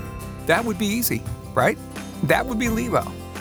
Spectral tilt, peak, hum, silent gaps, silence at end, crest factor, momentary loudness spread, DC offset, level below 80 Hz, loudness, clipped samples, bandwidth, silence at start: -4.5 dB/octave; -2 dBFS; none; none; 0 s; 22 dB; 11 LU; under 0.1%; -40 dBFS; -23 LUFS; under 0.1%; over 20 kHz; 0 s